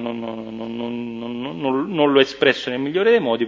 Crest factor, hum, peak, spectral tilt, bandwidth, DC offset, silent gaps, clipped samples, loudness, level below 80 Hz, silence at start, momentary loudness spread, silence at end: 20 dB; none; 0 dBFS; -5.5 dB/octave; 7.6 kHz; under 0.1%; none; under 0.1%; -20 LUFS; -60 dBFS; 0 s; 13 LU; 0 s